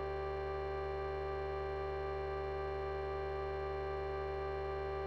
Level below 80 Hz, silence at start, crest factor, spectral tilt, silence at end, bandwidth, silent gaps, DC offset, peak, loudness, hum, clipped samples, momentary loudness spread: -48 dBFS; 0 s; 10 dB; -8 dB/octave; 0 s; 6.4 kHz; none; 0.1%; -30 dBFS; -40 LUFS; none; under 0.1%; 0 LU